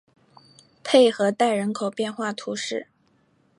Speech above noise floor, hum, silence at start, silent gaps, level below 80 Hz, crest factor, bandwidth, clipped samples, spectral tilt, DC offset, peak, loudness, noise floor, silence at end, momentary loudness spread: 42 dB; none; 0.85 s; none; -78 dBFS; 20 dB; 11.5 kHz; under 0.1%; -4 dB/octave; under 0.1%; -4 dBFS; -23 LUFS; -64 dBFS; 0.75 s; 12 LU